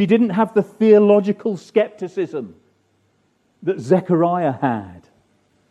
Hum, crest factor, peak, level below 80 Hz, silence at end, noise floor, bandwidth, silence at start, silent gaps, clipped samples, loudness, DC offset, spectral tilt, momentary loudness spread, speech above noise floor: none; 16 dB; -2 dBFS; -66 dBFS; 0.75 s; -63 dBFS; 8.6 kHz; 0 s; none; under 0.1%; -18 LUFS; under 0.1%; -8.5 dB/octave; 14 LU; 46 dB